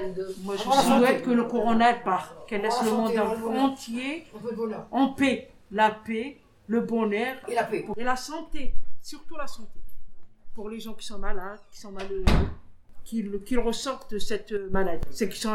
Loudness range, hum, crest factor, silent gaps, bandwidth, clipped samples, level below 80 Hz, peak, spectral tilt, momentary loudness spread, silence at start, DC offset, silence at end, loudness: 12 LU; none; 20 dB; none; 17 kHz; under 0.1%; -38 dBFS; -6 dBFS; -5 dB/octave; 17 LU; 0 s; under 0.1%; 0 s; -27 LUFS